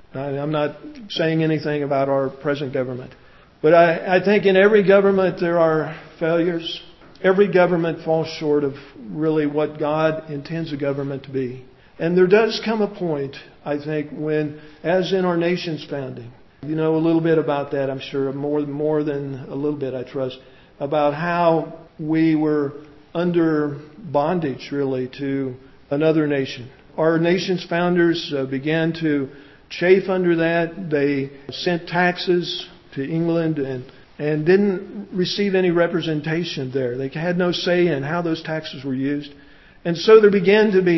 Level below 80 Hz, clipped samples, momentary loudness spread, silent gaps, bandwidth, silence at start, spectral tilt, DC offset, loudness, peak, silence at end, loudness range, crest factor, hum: -58 dBFS; under 0.1%; 14 LU; none; 6 kHz; 0.15 s; -7 dB/octave; under 0.1%; -20 LUFS; 0 dBFS; 0 s; 6 LU; 20 dB; none